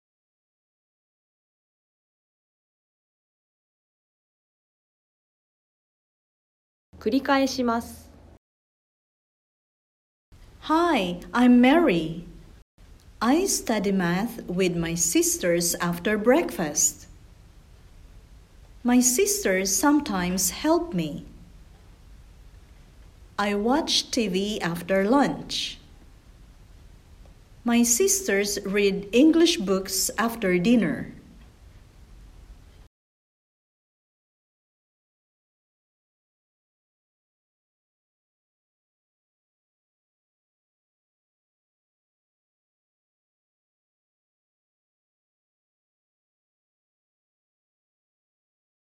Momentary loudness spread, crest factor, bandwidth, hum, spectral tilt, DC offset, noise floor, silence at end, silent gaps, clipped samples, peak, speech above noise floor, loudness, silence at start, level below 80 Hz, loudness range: 11 LU; 20 dB; 16 kHz; none; -3.5 dB/octave; under 0.1%; -50 dBFS; 16.35 s; 8.37-10.32 s, 12.62-12.78 s; under 0.1%; -6 dBFS; 28 dB; -23 LUFS; 7 s; -52 dBFS; 8 LU